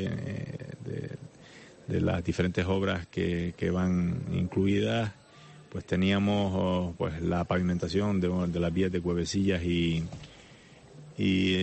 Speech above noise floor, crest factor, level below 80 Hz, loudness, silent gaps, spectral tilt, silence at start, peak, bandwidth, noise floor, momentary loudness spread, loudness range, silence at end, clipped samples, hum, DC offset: 25 dB; 14 dB; -50 dBFS; -29 LUFS; none; -6.5 dB/octave; 0 s; -16 dBFS; 8.4 kHz; -53 dBFS; 13 LU; 2 LU; 0 s; under 0.1%; none; under 0.1%